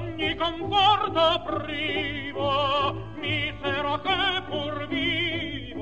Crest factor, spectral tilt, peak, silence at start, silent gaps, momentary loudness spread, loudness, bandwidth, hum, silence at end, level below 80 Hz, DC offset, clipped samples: 18 dB; -5.5 dB/octave; -8 dBFS; 0 s; none; 9 LU; -25 LUFS; 8.6 kHz; none; 0 s; -48 dBFS; 0.5%; under 0.1%